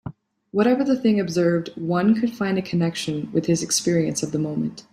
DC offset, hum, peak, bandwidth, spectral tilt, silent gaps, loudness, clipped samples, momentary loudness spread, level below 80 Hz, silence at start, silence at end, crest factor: under 0.1%; none; -6 dBFS; 14.5 kHz; -5 dB/octave; none; -22 LUFS; under 0.1%; 6 LU; -60 dBFS; 0.05 s; 0.1 s; 16 dB